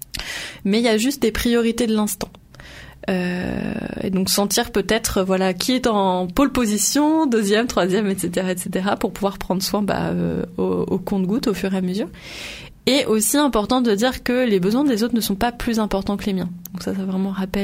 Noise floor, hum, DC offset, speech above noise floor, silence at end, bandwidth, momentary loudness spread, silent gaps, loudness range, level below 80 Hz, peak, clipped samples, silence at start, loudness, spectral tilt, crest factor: -41 dBFS; none; under 0.1%; 21 dB; 0 s; 16 kHz; 10 LU; none; 4 LU; -42 dBFS; -2 dBFS; under 0.1%; 0.15 s; -20 LUFS; -4.5 dB/octave; 20 dB